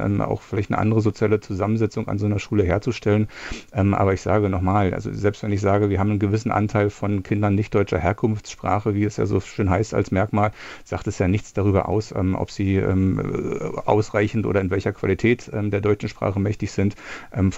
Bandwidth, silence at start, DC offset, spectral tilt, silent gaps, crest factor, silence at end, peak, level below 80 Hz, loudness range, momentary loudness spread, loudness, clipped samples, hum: 8 kHz; 0 s; under 0.1%; -7.5 dB/octave; none; 20 dB; 0 s; -2 dBFS; -46 dBFS; 1 LU; 5 LU; -22 LUFS; under 0.1%; none